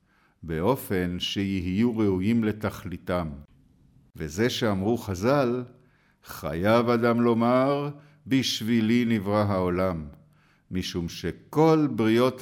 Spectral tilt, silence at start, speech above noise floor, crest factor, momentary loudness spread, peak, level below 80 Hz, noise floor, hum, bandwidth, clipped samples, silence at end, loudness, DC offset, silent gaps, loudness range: -6 dB/octave; 0.4 s; 35 dB; 16 dB; 14 LU; -10 dBFS; -52 dBFS; -60 dBFS; none; 17.5 kHz; under 0.1%; 0 s; -25 LUFS; under 0.1%; none; 4 LU